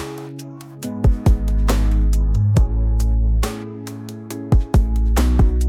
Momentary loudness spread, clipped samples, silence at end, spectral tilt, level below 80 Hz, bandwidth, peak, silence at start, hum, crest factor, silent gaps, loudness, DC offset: 14 LU; under 0.1%; 0 s; -7 dB/octave; -18 dBFS; 14.5 kHz; -4 dBFS; 0 s; none; 12 dB; none; -19 LUFS; under 0.1%